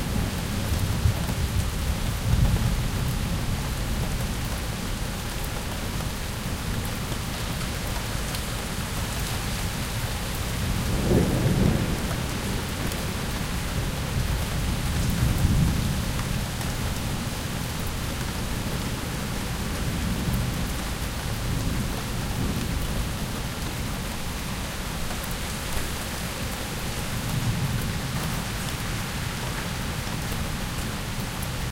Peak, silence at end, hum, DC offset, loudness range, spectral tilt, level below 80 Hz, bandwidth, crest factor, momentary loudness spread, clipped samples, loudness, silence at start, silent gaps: -6 dBFS; 0 s; none; under 0.1%; 4 LU; -4.5 dB/octave; -32 dBFS; 17 kHz; 20 dB; 6 LU; under 0.1%; -28 LUFS; 0 s; none